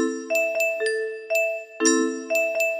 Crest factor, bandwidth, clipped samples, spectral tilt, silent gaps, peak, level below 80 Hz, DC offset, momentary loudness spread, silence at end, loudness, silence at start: 18 dB; 15 kHz; under 0.1%; -0.5 dB/octave; none; -6 dBFS; -76 dBFS; under 0.1%; 5 LU; 0 s; -23 LUFS; 0 s